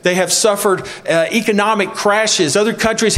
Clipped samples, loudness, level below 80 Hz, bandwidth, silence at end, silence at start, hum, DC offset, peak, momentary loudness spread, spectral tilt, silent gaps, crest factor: under 0.1%; -14 LUFS; -48 dBFS; 16 kHz; 0 s; 0.05 s; none; under 0.1%; 0 dBFS; 4 LU; -3 dB/octave; none; 14 dB